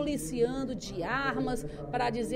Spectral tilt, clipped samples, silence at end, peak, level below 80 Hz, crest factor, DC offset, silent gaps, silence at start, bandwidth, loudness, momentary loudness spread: -5 dB/octave; under 0.1%; 0 s; -16 dBFS; -48 dBFS; 16 dB; under 0.1%; none; 0 s; 16 kHz; -32 LUFS; 6 LU